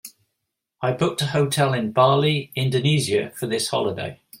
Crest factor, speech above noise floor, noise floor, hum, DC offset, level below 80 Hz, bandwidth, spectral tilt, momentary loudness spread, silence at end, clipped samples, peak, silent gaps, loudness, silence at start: 18 dB; 59 dB; -80 dBFS; none; under 0.1%; -60 dBFS; 16.5 kHz; -5 dB/octave; 9 LU; 0.05 s; under 0.1%; -4 dBFS; none; -21 LUFS; 0.05 s